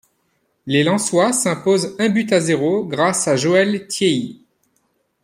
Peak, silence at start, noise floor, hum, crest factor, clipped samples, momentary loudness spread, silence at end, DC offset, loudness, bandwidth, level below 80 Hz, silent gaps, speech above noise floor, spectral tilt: -2 dBFS; 0.65 s; -66 dBFS; none; 16 dB; under 0.1%; 4 LU; 0.9 s; under 0.1%; -17 LUFS; 16 kHz; -62 dBFS; none; 49 dB; -4 dB/octave